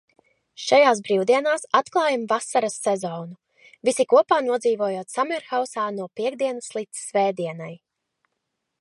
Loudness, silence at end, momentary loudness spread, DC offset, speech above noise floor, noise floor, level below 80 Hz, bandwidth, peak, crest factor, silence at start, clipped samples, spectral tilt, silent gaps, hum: -22 LUFS; 1.05 s; 13 LU; under 0.1%; 57 dB; -79 dBFS; -80 dBFS; 11.5 kHz; -4 dBFS; 20 dB; 0.6 s; under 0.1%; -3.5 dB/octave; none; none